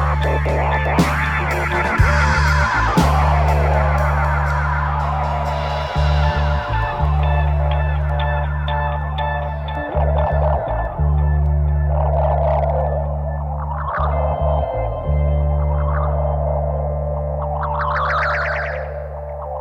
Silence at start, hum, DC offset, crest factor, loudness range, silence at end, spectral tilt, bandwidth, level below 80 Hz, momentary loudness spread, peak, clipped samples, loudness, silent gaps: 0 s; none; under 0.1%; 16 dB; 4 LU; 0 s; -7 dB/octave; 9.4 kHz; -22 dBFS; 7 LU; -2 dBFS; under 0.1%; -19 LUFS; none